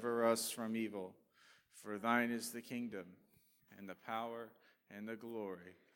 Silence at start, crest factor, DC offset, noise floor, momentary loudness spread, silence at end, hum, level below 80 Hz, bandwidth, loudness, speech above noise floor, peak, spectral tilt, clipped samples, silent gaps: 0 s; 24 dB; under 0.1%; -70 dBFS; 20 LU; 0.25 s; none; under -90 dBFS; 19 kHz; -41 LUFS; 26 dB; -18 dBFS; -3.5 dB/octave; under 0.1%; none